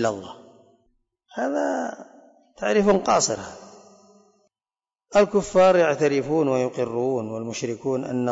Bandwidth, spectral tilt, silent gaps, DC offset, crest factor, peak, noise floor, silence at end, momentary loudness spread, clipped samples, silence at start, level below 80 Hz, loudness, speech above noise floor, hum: 8 kHz; -4.5 dB/octave; none; under 0.1%; 16 dB; -8 dBFS; under -90 dBFS; 0 s; 15 LU; under 0.1%; 0 s; -56 dBFS; -22 LUFS; over 68 dB; none